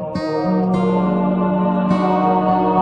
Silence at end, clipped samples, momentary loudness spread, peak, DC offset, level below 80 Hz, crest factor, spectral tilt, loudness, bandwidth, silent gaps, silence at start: 0 s; under 0.1%; 3 LU; -4 dBFS; under 0.1%; -46 dBFS; 12 dB; -9 dB/octave; -17 LUFS; 6 kHz; none; 0 s